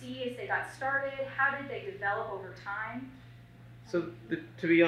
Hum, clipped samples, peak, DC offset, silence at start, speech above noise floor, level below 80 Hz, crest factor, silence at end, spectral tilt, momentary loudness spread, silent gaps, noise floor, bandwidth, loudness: none; under 0.1%; -12 dBFS; under 0.1%; 0 s; 20 dB; -66 dBFS; 20 dB; 0 s; -6.5 dB/octave; 21 LU; none; -52 dBFS; 10.5 kHz; -34 LUFS